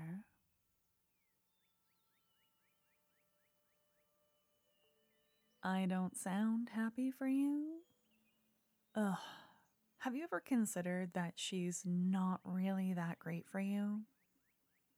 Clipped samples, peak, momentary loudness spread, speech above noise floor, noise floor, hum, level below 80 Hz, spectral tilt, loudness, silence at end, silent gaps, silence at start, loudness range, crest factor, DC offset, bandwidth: under 0.1%; -26 dBFS; 10 LU; 41 dB; -81 dBFS; none; under -90 dBFS; -5.5 dB/octave; -41 LUFS; 0.95 s; none; 0 s; 5 LU; 16 dB; under 0.1%; 16 kHz